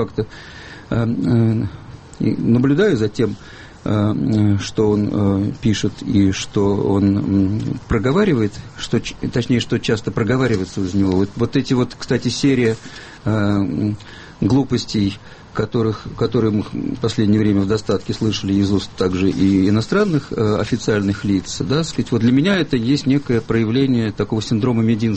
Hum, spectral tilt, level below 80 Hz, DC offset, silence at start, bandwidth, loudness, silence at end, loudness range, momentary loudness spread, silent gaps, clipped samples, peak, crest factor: none; -6.5 dB/octave; -42 dBFS; under 0.1%; 0 s; 8.8 kHz; -18 LUFS; 0 s; 2 LU; 8 LU; none; under 0.1%; -4 dBFS; 14 dB